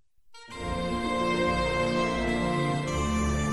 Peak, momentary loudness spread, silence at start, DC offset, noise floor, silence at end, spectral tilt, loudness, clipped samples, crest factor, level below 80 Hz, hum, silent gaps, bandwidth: -14 dBFS; 6 LU; 0.3 s; under 0.1%; -51 dBFS; 0 s; -5.5 dB/octave; -28 LUFS; under 0.1%; 14 dB; -38 dBFS; none; none; 13.5 kHz